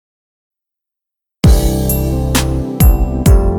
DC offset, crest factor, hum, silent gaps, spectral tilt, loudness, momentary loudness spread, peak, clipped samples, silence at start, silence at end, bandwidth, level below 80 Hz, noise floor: under 0.1%; 12 dB; none; none; -6 dB/octave; -13 LUFS; 4 LU; 0 dBFS; under 0.1%; 1.45 s; 0 s; 18.5 kHz; -16 dBFS; -83 dBFS